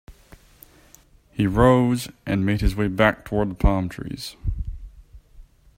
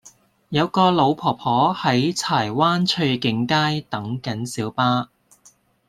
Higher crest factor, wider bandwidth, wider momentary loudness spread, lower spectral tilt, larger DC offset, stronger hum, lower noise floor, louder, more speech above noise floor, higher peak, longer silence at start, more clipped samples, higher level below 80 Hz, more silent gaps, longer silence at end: about the same, 20 dB vs 18 dB; first, 16 kHz vs 14 kHz; first, 16 LU vs 9 LU; first, -7 dB/octave vs -5 dB/octave; neither; neither; about the same, -53 dBFS vs -56 dBFS; about the same, -22 LUFS vs -20 LUFS; second, 32 dB vs 36 dB; about the same, -2 dBFS vs -2 dBFS; about the same, 0.1 s vs 0.05 s; neither; first, -32 dBFS vs -60 dBFS; neither; second, 0.35 s vs 0.85 s